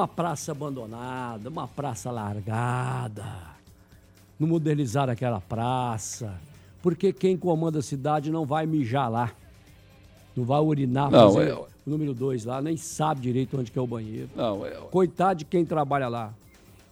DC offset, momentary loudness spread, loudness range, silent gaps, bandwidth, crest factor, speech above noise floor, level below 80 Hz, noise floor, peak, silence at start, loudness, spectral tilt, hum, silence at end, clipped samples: under 0.1%; 11 LU; 8 LU; none; 15.5 kHz; 22 dB; 28 dB; -58 dBFS; -54 dBFS; -4 dBFS; 0 s; -26 LUFS; -6.5 dB/octave; none; 0.55 s; under 0.1%